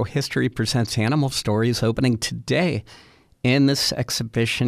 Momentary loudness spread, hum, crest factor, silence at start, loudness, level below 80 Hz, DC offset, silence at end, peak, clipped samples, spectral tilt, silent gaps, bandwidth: 6 LU; none; 16 dB; 0 s; -22 LUFS; -48 dBFS; under 0.1%; 0 s; -6 dBFS; under 0.1%; -5 dB/octave; none; 15.5 kHz